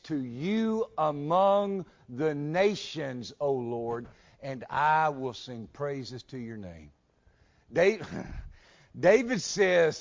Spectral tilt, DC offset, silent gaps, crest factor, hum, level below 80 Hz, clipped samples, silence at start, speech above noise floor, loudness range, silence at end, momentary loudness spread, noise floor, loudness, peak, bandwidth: -5 dB/octave; under 0.1%; none; 18 dB; none; -56 dBFS; under 0.1%; 0.05 s; 36 dB; 5 LU; 0 s; 17 LU; -65 dBFS; -28 LUFS; -10 dBFS; 7.6 kHz